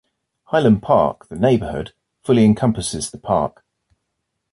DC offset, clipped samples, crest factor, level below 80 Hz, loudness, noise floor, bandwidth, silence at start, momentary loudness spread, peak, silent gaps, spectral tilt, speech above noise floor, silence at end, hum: under 0.1%; under 0.1%; 16 dB; -44 dBFS; -18 LUFS; -76 dBFS; 11.5 kHz; 0.5 s; 13 LU; -4 dBFS; none; -6.5 dB/octave; 59 dB; 1.05 s; none